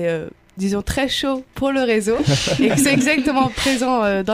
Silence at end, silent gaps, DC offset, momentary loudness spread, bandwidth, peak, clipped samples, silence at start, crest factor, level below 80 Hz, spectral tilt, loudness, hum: 0 s; none; under 0.1%; 8 LU; 15.5 kHz; -4 dBFS; under 0.1%; 0 s; 14 dB; -40 dBFS; -4.5 dB/octave; -18 LUFS; none